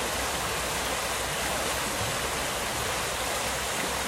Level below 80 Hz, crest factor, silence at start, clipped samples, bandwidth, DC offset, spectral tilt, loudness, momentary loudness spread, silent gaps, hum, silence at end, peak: -44 dBFS; 14 dB; 0 s; under 0.1%; 16 kHz; under 0.1%; -2 dB/octave; -28 LUFS; 1 LU; none; none; 0 s; -16 dBFS